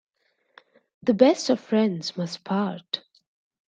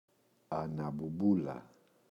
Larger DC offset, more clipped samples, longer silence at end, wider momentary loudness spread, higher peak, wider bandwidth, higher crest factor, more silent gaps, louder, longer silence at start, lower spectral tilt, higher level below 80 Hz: neither; neither; first, 0.7 s vs 0.45 s; about the same, 13 LU vs 11 LU; first, -4 dBFS vs -18 dBFS; first, 9.2 kHz vs 7 kHz; about the same, 22 dB vs 18 dB; neither; first, -24 LUFS vs -36 LUFS; first, 1.05 s vs 0.5 s; second, -5.5 dB/octave vs -10 dB/octave; about the same, -72 dBFS vs -68 dBFS